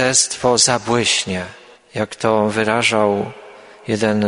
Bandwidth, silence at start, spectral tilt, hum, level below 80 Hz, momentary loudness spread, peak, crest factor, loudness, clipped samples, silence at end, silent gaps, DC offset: 11 kHz; 0 s; -3 dB/octave; none; -54 dBFS; 14 LU; 0 dBFS; 18 dB; -17 LUFS; under 0.1%; 0 s; none; under 0.1%